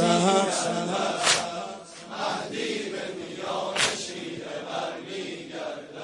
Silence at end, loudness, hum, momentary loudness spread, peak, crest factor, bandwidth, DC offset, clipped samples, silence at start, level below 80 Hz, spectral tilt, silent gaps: 0 s; -27 LUFS; none; 13 LU; -8 dBFS; 20 dB; 11.5 kHz; under 0.1%; under 0.1%; 0 s; -70 dBFS; -3 dB/octave; none